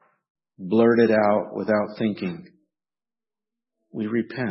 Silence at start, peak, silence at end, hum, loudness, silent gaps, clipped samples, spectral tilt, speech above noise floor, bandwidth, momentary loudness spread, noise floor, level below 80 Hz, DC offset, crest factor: 0.6 s; -6 dBFS; 0 s; none; -22 LUFS; none; under 0.1%; -11 dB/octave; over 68 dB; 5.8 kHz; 17 LU; under -90 dBFS; -68 dBFS; under 0.1%; 18 dB